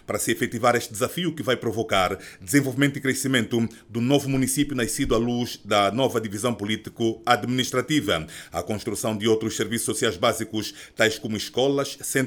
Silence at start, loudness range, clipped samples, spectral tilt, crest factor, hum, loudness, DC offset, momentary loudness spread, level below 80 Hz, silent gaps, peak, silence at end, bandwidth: 0.1 s; 2 LU; under 0.1%; -4 dB/octave; 20 dB; none; -24 LUFS; under 0.1%; 7 LU; -48 dBFS; none; -4 dBFS; 0 s; over 20 kHz